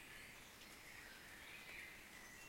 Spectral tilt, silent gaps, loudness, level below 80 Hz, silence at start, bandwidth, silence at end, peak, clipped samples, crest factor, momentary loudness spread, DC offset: -1.5 dB/octave; none; -56 LUFS; -72 dBFS; 0 s; 16.5 kHz; 0 s; -42 dBFS; under 0.1%; 16 dB; 4 LU; under 0.1%